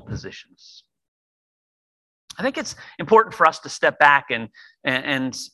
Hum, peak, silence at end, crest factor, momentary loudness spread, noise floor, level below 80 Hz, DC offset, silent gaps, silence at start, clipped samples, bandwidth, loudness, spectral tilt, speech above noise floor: none; 0 dBFS; 0.05 s; 22 dB; 19 LU; under -90 dBFS; -54 dBFS; under 0.1%; 1.08-2.28 s; 0.05 s; under 0.1%; 12.5 kHz; -19 LUFS; -3.5 dB/octave; over 69 dB